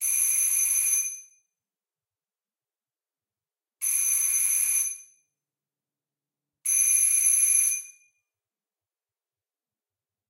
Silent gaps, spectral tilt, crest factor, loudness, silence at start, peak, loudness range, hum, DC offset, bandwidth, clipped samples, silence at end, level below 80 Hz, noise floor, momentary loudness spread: none; 5 dB/octave; 18 dB; -21 LUFS; 0 s; -10 dBFS; 6 LU; none; under 0.1%; 16.5 kHz; under 0.1%; 2.4 s; -74 dBFS; under -90 dBFS; 12 LU